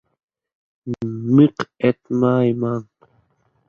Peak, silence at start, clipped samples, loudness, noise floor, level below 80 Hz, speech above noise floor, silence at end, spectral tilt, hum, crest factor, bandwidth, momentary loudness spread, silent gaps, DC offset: -2 dBFS; 0.85 s; under 0.1%; -19 LUFS; -63 dBFS; -60 dBFS; 45 dB; 0.85 s; -9 dB/octave; none; 20 dB; 7 kHz; 14 LU; none; under 0.1%